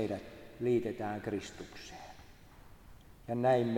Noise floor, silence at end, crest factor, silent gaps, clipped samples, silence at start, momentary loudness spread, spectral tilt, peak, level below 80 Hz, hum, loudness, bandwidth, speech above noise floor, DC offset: -56 dBFS; 0 s; 18 dB; none; under 0.1%; 0 s; 21 LU; -7 dB/octave; -18 dBFS; -60 dBFS; none; -35 LUFS; 18 kHz; 22 dB; under 0.1%